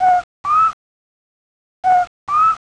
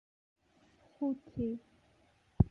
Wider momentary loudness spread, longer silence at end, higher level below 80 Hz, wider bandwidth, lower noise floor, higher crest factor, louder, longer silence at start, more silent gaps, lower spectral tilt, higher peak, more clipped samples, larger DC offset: about the same, 4 LU vs 5 LU; first, 0.15 s vs 0 s; second, -54 dBFS vs -48 dBFS; first, 9.6 kHz vs 5.8 kHz; first, under -90 dBFS vs -69 dBFS; second, 12 dB vs 28 dB; first, -16 LUFS vs -38 LUFS; second, 0 s vs 1 s; first, 0.24-0.44 s, 0.73-1.83 s, 2.07-2.27 s vs none; second, -3.5 dB/octave vs -11.5 dB/octave; first, -6 dBFS vs -10 dBFS; neither; neither